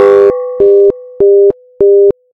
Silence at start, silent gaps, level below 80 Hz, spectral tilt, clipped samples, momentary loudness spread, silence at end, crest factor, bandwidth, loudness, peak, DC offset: 0 s; none; -44 dBFS; -8 dB/octave; 1%; 5 LU; 0.2 s; 8 dB; 3.8 kHz; -8 LUFS; 0 dBFS; under 0.1%